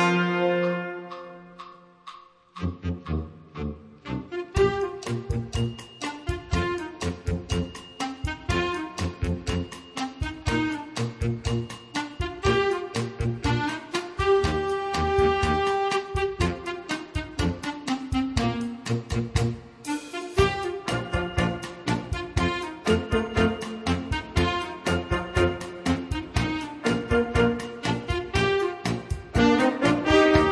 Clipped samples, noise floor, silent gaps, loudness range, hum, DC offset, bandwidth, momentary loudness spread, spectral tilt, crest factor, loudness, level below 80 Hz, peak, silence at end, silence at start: under 0.1%; -47 dBFS; none; 5 LU; none; under 0.1%; 11 kHz; 11 LU; -5.5 dB/octave; 22 dB; -27 LUFS; -38 dBFS; -6 dBFS; 0 s; 0 s